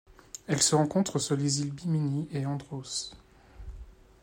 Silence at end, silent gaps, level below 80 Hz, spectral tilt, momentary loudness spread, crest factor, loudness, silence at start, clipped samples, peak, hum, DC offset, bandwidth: 0.3 s; none; -54 dBFS; -4.5 dB/octave; 23 LU; 20 dB; -29 LUFS; 0.35 s; under 0.1%; -10 dBFS; none; under 0.1%; 16 kHz